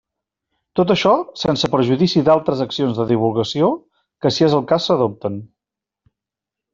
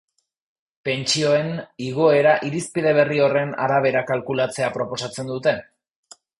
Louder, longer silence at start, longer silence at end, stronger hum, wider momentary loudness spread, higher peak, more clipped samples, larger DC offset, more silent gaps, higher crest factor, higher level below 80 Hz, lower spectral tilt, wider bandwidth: first, -17 LUFS vs -21 LUFS; about the same, 0.75 s vs 0.85 s; first, 1.3 s vs 0.75 s; neither; second, 8 LU vs 11 LU; about the same, -2 dBFS vs -2 dBFS; neither; neither; neither; about the same, 16 dB vs 18 dB; first, -54 dBFS vs -62 dBFS; first, -6.5 dB/octave vs -4.5 dB/octave; second, 7.6 kHz vs 11.5 kHz